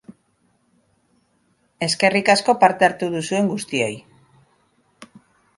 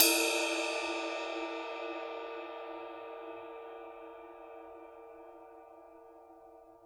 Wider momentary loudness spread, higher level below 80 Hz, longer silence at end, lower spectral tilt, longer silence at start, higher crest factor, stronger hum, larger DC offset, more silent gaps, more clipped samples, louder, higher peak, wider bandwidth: second, 10 LU vs 24 LU; first, -66 dBFS vs -78 dBFS; first, 0.5 s vs 0 s; first, -4 dB/octave vs 0.5 dB/octave; about the same, 0.1 s vs 0 s; second, 22 dB vs 32 dB; neither; neither; neither; neither; first, -19 LUFS vs -35 LUFS; first, 0 dBFS vs -4 dBFS; second, 11.5 kHz vs over 20 kHz